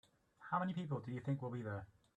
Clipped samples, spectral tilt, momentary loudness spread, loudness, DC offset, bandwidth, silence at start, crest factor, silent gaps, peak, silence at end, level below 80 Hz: under 0.1%; -8.5 dB/octave; 8 LU; -43 LUFS; under 0.1%; 8.6 kHz; 0.4 s; 18 dB; none; -26 dBFS; 0.3 s; -78 dBFS